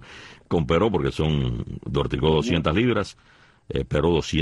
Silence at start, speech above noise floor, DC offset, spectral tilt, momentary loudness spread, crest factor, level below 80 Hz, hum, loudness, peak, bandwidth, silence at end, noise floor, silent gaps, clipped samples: 0 s; 22 dB; under 0.1%; -6.5 dB/octave; 11 LU; 16 dB; -38 dBFS; none; -23 LUFS; -8 dBFS; 11 kHz; 0 s; -45 dBFS; none; under 0.1%